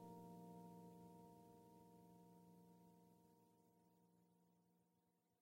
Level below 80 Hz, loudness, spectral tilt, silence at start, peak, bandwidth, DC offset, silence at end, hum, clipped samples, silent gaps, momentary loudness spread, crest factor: under -90 dBFS; -65 LUFS; -7.5 dB/octave; 0 s; -50 dBFS; 16 kHz; under 0.1%; 0 s; none; under 0.1%; none; 8 LU; 16 dB